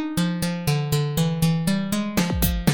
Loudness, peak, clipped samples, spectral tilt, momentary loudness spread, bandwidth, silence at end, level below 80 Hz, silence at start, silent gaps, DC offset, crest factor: -23 LUFS; -6 dBFS; under 0.1%; -5.5 dB/octave; 3 LU; 17.5 kHz; 0 s; -34 dBFS; 0 s; none; under 0.1%; 18 dB